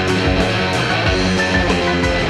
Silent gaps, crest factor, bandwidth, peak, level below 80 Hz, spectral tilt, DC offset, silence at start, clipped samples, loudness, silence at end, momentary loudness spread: none; 14 dB; 12.5 kHz; -4 dBFS; -28 dBFS; -5 dB/octave; under 0.1%; 0 s; under 0.1%; -16 LUFS; 0 s; 1 LU